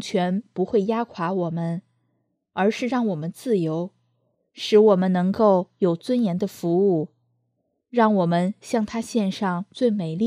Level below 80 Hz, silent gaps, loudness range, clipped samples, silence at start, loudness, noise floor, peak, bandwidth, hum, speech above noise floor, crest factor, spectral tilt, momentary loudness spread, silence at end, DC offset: -66 dBFS; none; 5 LU; under 0.1%; 0 s; -22 LUFS; -73 dBFS; -6 dBFS; 14.5 kHz; none; 52 dB; 18 dB; -7 dB/octave; 9 LU; 0 s; under 0.1%